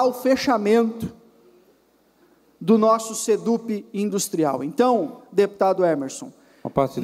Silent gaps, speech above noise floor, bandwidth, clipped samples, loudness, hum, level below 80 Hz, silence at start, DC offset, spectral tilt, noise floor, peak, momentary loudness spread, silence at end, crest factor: none; 39 dB; 16 kHz; under 0.1%; -21 LUFS; none; -58 dBFS; 0 s; under 0.1%; -5 dB/octave; -60 dBFS; -6 dBFS; 13 LU; 0 s; 16 dB